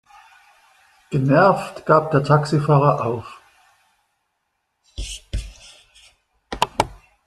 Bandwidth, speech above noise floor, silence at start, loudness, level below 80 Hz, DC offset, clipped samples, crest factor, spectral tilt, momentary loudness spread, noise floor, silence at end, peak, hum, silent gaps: 12.5 kHz; 57 dB; 1.1 s; -19 LUFS; -40 dBFS; under 0.1%; under 0.1%; 20 dB; -6.5 dB/octave; 19 LU; -74 dBFS; 0.3 s; -2 dBFS; none; none